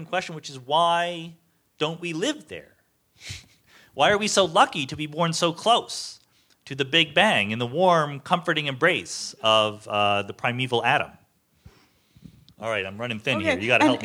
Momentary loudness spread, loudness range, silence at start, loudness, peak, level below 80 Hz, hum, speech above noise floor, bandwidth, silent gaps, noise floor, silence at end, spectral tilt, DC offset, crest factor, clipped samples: 18 LU; 6 LU; 0 s; -23 LUFS; -4 dBFS; -64 dBFS; none; 35 dB; 16 kHz; none; -58 dBFS; 0 s; -3.5 dB/octave; under 0.1%; 22 dB; under 0.1%